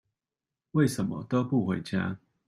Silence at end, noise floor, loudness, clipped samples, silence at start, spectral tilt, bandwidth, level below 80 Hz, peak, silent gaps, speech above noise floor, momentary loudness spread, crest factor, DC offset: 0.3 s; under -90 dBFS; -29 LUFS; under 0.1%; 0.75 s; -7 dB/octave; 15.5 kHz; -66 dBFS; -12 dBFS; none; over 62 dB; 6 LU; 18 dB; under 0.1%